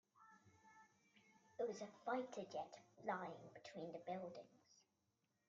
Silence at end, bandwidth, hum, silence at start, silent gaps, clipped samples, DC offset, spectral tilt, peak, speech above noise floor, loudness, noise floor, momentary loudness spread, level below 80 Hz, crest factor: 0.75 s; 7.4 kHz; none; 0.15 s; none; under 0.1%; under 0.1%; -4 dB/octave; -32 dBFS; 36 dB; -50 LUFS; -87 dBFS; 22 LU; under -90 dBFS; 20 dB